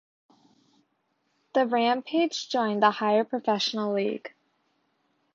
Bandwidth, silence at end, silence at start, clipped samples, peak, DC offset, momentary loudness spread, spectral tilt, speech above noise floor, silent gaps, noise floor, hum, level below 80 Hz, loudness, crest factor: 7.8 kHz; 1.05 s; 1.55 s; under 0.1%; -6 dBFS; under 0.1%; 7 LU; -4.5 dB/octave; 49 dB; none; -74 dBFS; none; -80 dBFS; -26 LUFS; 22 dB